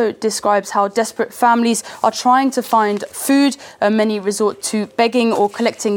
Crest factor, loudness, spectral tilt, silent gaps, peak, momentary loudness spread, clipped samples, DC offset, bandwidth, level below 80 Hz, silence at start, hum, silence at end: 16 dB; -17 LUFS; -3.5 dB/octave; none; 0 dBFS; 5 LU; under 0.1%; under 0.1%; 19 kHz; -68 dBFS; 0 s; none; 0 s